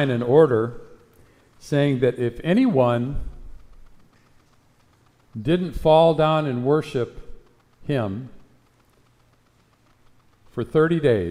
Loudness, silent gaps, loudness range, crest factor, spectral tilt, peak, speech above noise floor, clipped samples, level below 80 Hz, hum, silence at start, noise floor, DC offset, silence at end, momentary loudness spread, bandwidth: -21 LUFS; none; 11 LU; 20 dB; -8 dB/octave; -4 dBFS; 40 dB; under 0.1%; -44 dBFS; none; 0 s; -60 dBFS; under 0.1%; 0 s; 18 LU; 12 kHz